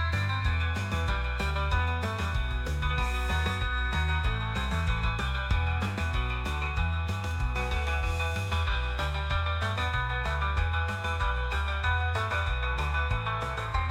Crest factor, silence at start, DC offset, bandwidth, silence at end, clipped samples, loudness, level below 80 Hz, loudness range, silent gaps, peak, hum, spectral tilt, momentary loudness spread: 14 dB; 0 s; under 0.1%; 13.5 kHz; 0 s; under 0.1%; -30 LUFS; -32 dBFS; 1 LU; none; -16 dBFS; none; -5.5 dB/octave; 3 LU